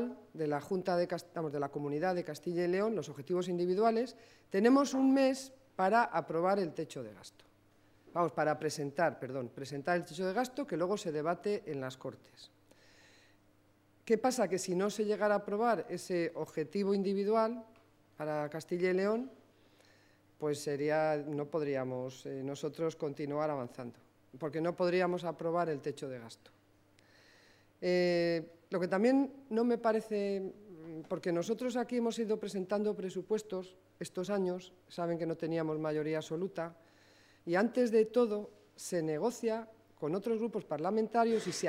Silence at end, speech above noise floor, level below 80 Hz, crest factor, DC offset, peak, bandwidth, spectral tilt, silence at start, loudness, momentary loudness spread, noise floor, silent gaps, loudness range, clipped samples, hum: 0 s; 34 dB; -80 dBFS; 20 dB; under 0.1%; -14 dBFS; 16 kHz; -6 dB/octave; 0 s; -34 LUFS; 13 LU; -68 dBFS; none; 6 LU; under 0.1%; none